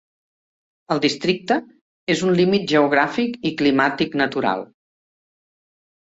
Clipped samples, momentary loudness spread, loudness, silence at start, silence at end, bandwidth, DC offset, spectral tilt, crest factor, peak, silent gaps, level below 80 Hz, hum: under 0.1%; 6 LU; -20 LUFS; 0.9 s; 1.45 s; 8 kHz; under 0.1%; -5.5 dB/octave; 18 dB; -4 dBFS; 1.81-2.07 s; -62 dBFS; none